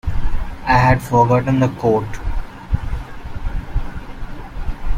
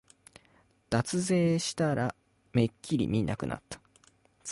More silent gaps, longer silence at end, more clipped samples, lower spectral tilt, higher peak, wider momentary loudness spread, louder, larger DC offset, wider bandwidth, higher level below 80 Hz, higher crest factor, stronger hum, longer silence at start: neither; about the same, 0 s vs 0 s; neither; first, -7.5 dB/octave vs -5.5 dB/octave; first, -2 dBFS vs -14 dBFS; first, 19 LU vs 14 LU; first, -18 LUFS vs -30 LUFS; neither; first, 15.5 kHz vs 11.5 kHz; first, -24 dBFS vs -56 dBFS; about the same, 16 dB vs 18 dB; neither; second, 0.05 s vs 0.9 s